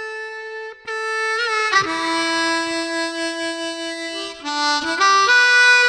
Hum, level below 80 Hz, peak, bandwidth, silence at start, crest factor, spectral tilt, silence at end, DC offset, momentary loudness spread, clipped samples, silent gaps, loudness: none; -62 dBFS; -2 dBFS; 13 kHz; 0 s; 16 dB; -0.5 dB/octave; 0 s; under 0.1%; 16 LU; under 0.1%; none; -18 LUFS